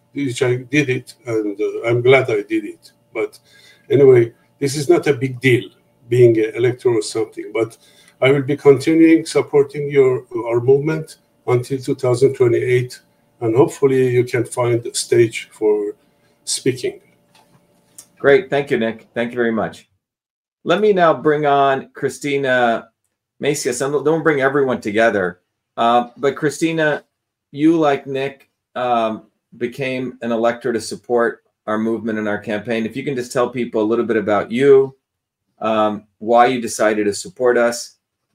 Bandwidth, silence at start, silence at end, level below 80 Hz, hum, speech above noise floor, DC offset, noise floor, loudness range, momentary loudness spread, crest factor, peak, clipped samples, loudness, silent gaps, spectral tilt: 15.5 kHz; 0.15 s; 0.45 s; -62 dBFS; none; 61 dB; under 0.1%; -77 dBFS; 5 LU; 12 LU; 18 dB; 0 dBFS; under 0.1%; -17 LUFS; 20.30-20.45 s, 20.52-20.56 s; -5.5 dB/octave